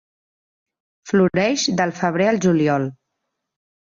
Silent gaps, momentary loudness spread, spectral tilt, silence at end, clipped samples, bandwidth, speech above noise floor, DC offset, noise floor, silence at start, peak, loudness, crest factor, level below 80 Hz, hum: none; 5 LU; -5 dB/octave; 1.05 s; under 0.1%; 7.6 kHz; 60 dB; under 0.1%; -78 dBFS; 1.05 s; -6 dBFS; -19 LUFS; 16 dB; -60 dBFS; none